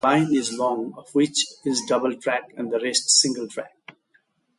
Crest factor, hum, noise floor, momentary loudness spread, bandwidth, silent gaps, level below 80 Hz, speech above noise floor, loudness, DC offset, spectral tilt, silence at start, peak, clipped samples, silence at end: 18 dB; none; -65 dBFS; 13 LU; 11.5 kHz; none; -72 dBFS; 42 dB; -22 LUFS; under 0.1%; -2.5 dB/octave; 0.05 s; -6 dBFS; under 0.1%; 0.9 s